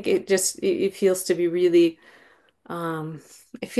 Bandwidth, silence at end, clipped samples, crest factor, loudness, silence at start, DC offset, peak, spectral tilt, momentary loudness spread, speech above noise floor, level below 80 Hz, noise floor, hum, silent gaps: 12.5 kHz; 0 s; under 0.1%; 16 dB; -22 LUFS; 0 s; under 0.1%; -8 dBFS; -4.5 dB/octave; 17 LU; 33 dB; -68 dBFS; -56 dBFS; none; none